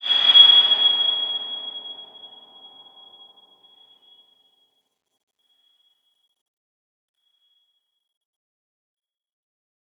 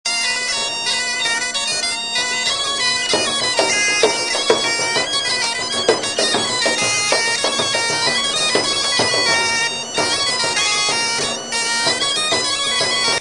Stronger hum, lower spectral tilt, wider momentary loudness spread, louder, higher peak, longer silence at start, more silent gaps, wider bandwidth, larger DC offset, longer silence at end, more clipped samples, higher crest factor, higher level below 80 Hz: neither; about the same, 0 dB/octave vs -0.5 dB/octave; first, 25 LU vs 3 LU; first, -13 LUFS vs -16 LUFS; about the same, -2 dBFS vs 0 dBFS; about the same, 0.05 s vs 0.05 s; neither; second, 7.8 kHz vs 10.5 kHz; second, under 0.1% vs 0.2%; first, 7.75 s vs 0 s; neither; first, 24 dB vs 18 dB; second, -90 dBFS vs -56 dBFS